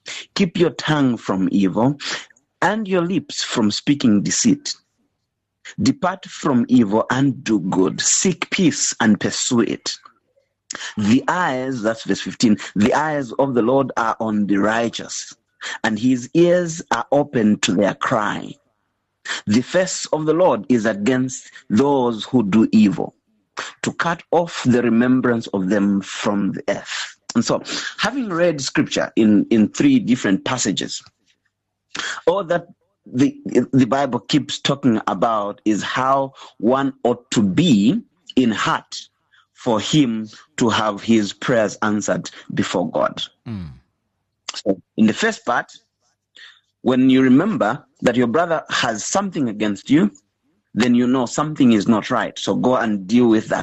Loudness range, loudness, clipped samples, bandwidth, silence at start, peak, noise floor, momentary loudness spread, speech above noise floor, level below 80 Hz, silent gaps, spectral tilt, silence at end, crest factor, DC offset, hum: 3 LU; -19 LUFS; under 0.1%; 8.6 kHz; 0.05 s; -6 dBFS; -75 dBFS; 11 LU; 57 dB; -56 dBFS; none; -4.5 dB/octave; 0 s; 14 dB; under 0.1%; none